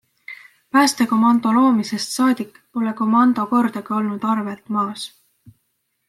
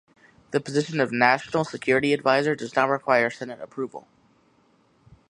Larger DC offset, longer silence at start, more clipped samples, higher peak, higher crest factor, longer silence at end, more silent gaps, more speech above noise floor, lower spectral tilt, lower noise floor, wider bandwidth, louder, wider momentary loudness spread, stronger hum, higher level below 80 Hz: neither; second, 0.3 s vs 0.5 s; neither; about the same, -4 dBFS vs -4 dBFS; second, 16 dB vs 22 dB; second, 1 s vs 1.3 s; neither; first, 53 dB vs 39 dB; about the same, -4.5 dB/octave vs -5.5 dB/octave; first, -71 dBFS vs -62 dBFS; first, 14 kHz vs 11.5 kHz; first, -19 LUFS vs -23 LUFS; about the same, 16 LU vs 14 LU; neither; about the same, -70 dBFS vs -66 dBFS